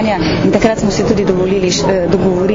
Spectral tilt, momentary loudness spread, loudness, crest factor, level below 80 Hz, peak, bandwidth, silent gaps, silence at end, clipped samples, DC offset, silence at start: -5.5 dB/octave; 2 LU; -13 LUFS; 12 dB; -32 dBFS; 0 dBFS; 7.6 kHz; none; 0 s; 0.1%; under 0.1%; 0 s